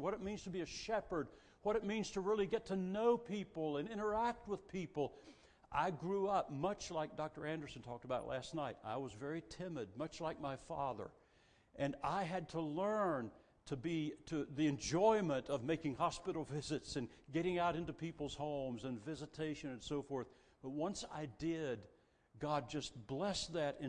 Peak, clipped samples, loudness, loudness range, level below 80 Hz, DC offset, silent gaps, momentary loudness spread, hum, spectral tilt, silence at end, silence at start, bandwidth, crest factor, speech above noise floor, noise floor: -20 dBFS; under 0.1%; -42 LUFS; 6 LU; -66 dBFS; under 0.1%; none; 9 LU; none; -5.5 dB/octave; 0 s; 0 s; 10 kHz; 20 dB; 30 dB; -71 dBFS